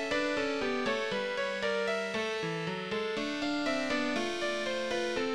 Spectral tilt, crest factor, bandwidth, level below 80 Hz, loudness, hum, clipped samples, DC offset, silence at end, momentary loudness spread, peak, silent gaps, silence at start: -4 dB/octave; 14 dB; 13 kHz; -62 dBFS; -32 LUFS; none; under 0.1%; under 0.1%; 0 s; 3 LU; -18 dBFS; none; 0 s